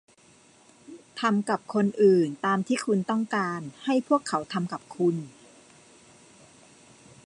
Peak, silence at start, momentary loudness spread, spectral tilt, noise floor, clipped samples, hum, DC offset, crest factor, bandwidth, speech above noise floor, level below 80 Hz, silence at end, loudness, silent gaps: -10 dBFS; 0.9 s; 12 LU; -6 dB/octave; -57 dBFS; under 0.1%; none; under 0.1%; 18 dB; 11 kHz; 32 dB; -74 dBFS; 1.95 s; -26 LUFS; none